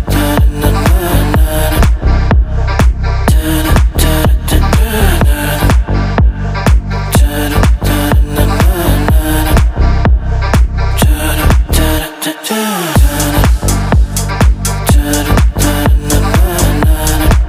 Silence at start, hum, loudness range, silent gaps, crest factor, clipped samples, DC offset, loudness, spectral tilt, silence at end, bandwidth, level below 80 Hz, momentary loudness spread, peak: 0 s; none; 1 LU; none; 10 dB; 0.3%; under 0.1%; -11 LUFS; -5 dB/octave; 0 s; 16 kHz; -12 dBFS; 3 LU; 0 dBFS